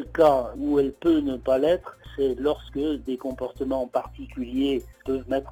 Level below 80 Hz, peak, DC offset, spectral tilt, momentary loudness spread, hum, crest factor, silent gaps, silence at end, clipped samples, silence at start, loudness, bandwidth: -46 dBFS; -8 dBFS; under 0.1%; -7 dB/octave; 10 LU; none; 16 dB; none; 0 s; under 0.1%; 0 s; -25 LUFS; 19.5 kHz